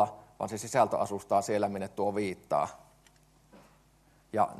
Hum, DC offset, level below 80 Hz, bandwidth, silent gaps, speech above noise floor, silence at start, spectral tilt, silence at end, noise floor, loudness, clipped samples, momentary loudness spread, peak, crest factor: none; under 0.1%; -68 dBFS; 13 kHz; none; 33 dB; 0 s; -5 dB/octave; 0 s; -64 dBFS; -31 LUFS; under 0.1%; 9 LU; -12 dBFS; 20 dB